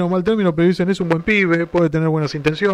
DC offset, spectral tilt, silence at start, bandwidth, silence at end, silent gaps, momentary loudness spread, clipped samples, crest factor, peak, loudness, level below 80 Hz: under 0.1%; -7.5 dB/octave; 0 s; 10 kHz; 0 s; none; 4 LU; under 0.1%; 14 dB; -4 dBFS; -17 LUFS; -46 dBFS